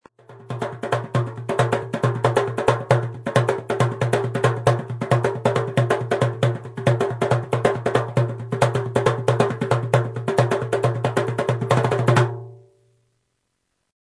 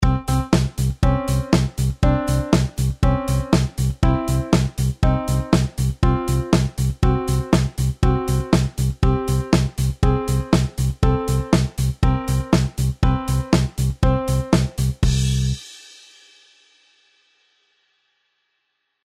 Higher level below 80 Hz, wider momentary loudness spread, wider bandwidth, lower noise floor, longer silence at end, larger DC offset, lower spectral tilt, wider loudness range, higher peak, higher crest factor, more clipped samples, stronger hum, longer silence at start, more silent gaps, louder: second, -54 dBFS vs -26 dBFS; about the same, 5 LU vs 4 LU; second, 11 kHz vs 15.5 kHz; about the same, -74 dBFS vs -73 dBFS; second, 1.55 s vs 3.25 s; neither; about the same, -6.5 dB/octave vs -6.5 dB/octave; about the same, 1 LU vs 3 LU; about the same, -2 dBFS vs -2 dBFS; about the same, 18 dB vs 16 dB; neither; neither; first, 0.3 s vs 0 s; neither; about the same, -22 LUFS vs -20 LUFS